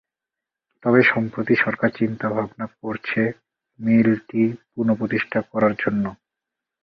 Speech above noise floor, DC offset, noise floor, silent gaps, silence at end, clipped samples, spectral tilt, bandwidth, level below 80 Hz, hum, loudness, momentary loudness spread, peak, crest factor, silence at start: 66 dB; under 0.1%; -87 dBFS; none; 0.7 s; under 0.1%; -9 dB/octave; 5.6 kHz; -60 dBFS; none; -21 LUFS; 11 LU; -2 dBFS; 20 dB; 0.85 s